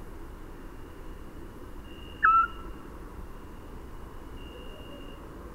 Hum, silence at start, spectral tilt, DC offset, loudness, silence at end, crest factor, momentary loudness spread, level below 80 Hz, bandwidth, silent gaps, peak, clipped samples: none; 0 s; -5 dB/octave; under 0.1%; -24 LUFS; 0 s; 24 dB; 23 LU; -44 dBFS; 16 kHz; none; -10 dBFS; under 0.1%